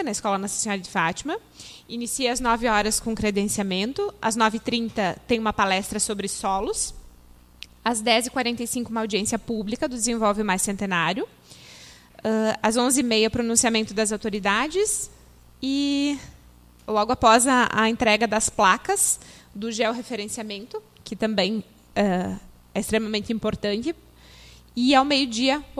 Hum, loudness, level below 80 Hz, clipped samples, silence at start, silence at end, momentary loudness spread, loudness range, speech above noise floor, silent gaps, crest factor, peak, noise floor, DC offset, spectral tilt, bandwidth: 60 Hz at -50 dBFS; -23 LUFS; -48 dBFS; under 0.1%; 0 s; 0 s; 13 LU; 6 LU; 28 dB; none; 22 dB; -2 dBFS; -51 dBFS; under 0.1%; -3 dB/octave; 15.5 kHz